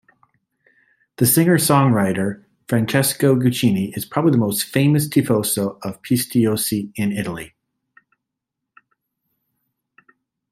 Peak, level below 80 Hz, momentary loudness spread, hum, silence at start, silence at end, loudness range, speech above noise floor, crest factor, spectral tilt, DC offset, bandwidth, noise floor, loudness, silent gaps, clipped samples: -2 dBFS; -58 dBFS; 11 LU; none; 1.2 s; 3.05 s; 10 LU; 64 dB; 18 dB; -5 dB/octave; under 0.1%; 16 kHz; -82 dBFS; -18 LUFS; none; under 0.1%